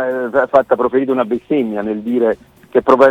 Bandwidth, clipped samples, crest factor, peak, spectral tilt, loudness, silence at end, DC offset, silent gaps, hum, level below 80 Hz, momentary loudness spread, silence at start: 8.2 kHz; under 0.1%; 14 dB; 0 dBFS; -7.5 dB/octave; -16 LUFS; 0 s; under 0.1%; none; none; -52 dBFS; 6 LU; 0 s